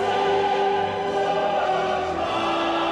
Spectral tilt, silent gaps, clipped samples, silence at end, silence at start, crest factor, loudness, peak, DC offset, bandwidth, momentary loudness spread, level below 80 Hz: -4.5 dB/octave; none; under 0.1%; 0 s; 0 s; 10 dB; -23 LUFS; -12 dBFS; under 0.1%; 11 kHz; 3 LU; -54 dBFS